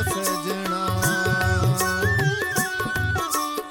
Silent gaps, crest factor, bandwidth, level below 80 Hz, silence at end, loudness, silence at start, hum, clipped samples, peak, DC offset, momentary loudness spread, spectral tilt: none; 16 dB; 19 kHz; -40 dBFS; 0 s; -23 LUFS; 0 s; none; under 0.1%; -8 dBFS; under 0.1%; 4 LU; -4 dB/octave